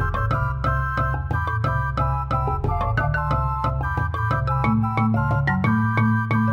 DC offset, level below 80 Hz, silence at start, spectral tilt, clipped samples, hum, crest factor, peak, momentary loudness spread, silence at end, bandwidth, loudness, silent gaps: under 0.1%; -30 dBFS; 0 s; -9 dB/octave; under 0.1%; none; 14 dB; -8 dBFS; 4 LU; 0 s; 6.6 kHz; -22 LUFS; none